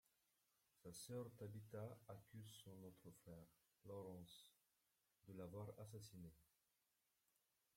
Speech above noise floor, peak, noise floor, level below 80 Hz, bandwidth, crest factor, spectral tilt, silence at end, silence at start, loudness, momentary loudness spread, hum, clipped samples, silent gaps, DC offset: 31 dB; -42 dBFS; -89 dBFS; -86 dBFS; 16.5 kHz; 18 dB; -5.5 dB/octave; 1.3 s; 0.75 s; -59 LUFS; 11 LU; none; under 0.1%; none; under 0.1%